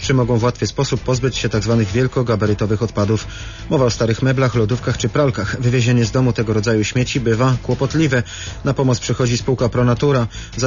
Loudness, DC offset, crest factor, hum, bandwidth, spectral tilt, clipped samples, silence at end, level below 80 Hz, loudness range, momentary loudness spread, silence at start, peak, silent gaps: -17 LUFS; under 0.1%; 12 dB; none; 7.4 kHz; -6 dB/octave; under 0.1%; 0 s; -36 dBFS; 1 LU; 4 LU; 0 s; -4 dBFS; none